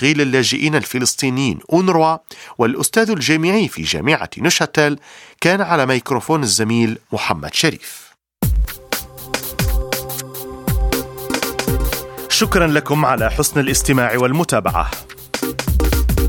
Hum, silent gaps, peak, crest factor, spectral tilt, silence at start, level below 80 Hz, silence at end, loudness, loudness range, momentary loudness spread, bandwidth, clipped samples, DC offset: none; none; 0 dBFS; 18 dB; -4 dB/octave; 0 s; -26 dBFS; 0 s; -17 LUFS; 5 LU; 10 LU; 19 kHz; under 0.1%; under 0.1%